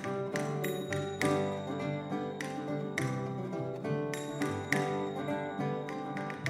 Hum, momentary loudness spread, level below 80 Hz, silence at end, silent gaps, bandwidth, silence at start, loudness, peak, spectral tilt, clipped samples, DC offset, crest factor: none; 6 LU; -72 dBFS; 0 s; none; 16 kHz; 0 s; -35 LUFS; -12 dBFS; -6 dB/octave; under 0.1%; under 0.1%; 22 dB